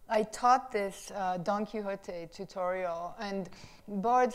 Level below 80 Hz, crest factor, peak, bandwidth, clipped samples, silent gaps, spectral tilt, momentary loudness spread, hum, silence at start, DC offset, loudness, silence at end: -62 dBFS; 20 dB; -12 dBFS; 14.5 kHz; under 0.1%; none; -5 dB/octave; 16 LU; none; 0 s; under 0.1%; -33 LUFS; 0 s